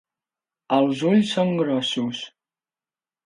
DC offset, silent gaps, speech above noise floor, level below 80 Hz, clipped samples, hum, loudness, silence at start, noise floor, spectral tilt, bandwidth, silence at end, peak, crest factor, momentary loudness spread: under 0.1%; none; over 69 dB; -72 dBFS; under 0.1%; none; -22 LUFS; 0.7 s; under -90 dBFS; -6 dB/octave; 11 kHz; 1 s; -6 dBFS; 18 dB; 11 LU